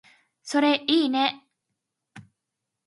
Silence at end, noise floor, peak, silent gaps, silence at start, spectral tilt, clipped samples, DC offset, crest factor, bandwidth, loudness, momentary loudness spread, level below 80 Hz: 0.65 s; -84 dBFS; -8 dBFS; none; 0.45 s; -3 dB/octave; under 0.1%; under 0.1%; 20 dB; 11.5 kHz; -23 LUFS; 20 LU; -78 dBFS